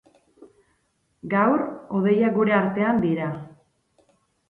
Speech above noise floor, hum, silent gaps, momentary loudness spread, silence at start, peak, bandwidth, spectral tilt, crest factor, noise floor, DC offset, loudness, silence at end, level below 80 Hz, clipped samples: 48 dB; none; none; 10 LU; 0.4 s; -6 dBFS; 4.1 kHz; -9.5 dB/octave; 18 dB; -69 dBFS; under 0.1%; -22 LUFS; 1 s; -64 dBFS; under 0.1%